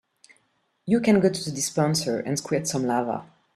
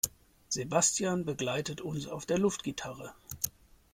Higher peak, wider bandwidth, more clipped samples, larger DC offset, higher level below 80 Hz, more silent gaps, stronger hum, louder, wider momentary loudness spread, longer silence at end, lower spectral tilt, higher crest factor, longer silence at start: first, -6 dBFS vs -12 dBFS; second, 14 kHz vs 16.5 kHz; neither; neither; about the same, -62 dBFS vs -62 dBFS; neither; neither; first, -24 LUFS vs -32 LUFS; second, 9 LU vs 13 LU; second, 0.3 s vs 0.45 s; first, -5 dB/octave vs -3.5 dB/octave; about the same, 18 dB vs 22 dB; first, 0.85 s vs 0.05 s